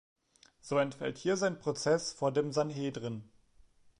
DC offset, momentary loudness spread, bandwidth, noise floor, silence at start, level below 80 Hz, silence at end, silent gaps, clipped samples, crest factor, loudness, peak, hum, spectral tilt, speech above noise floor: under 0.1%; 10 LU; 11 kHz; -63 dBFS; 0.65 s; -72 dBFS; 0.75 s; none; under 0.1%; 16 dB; -33 LUFS; -18 dBFS; none; -5 dB/octave; 31 dB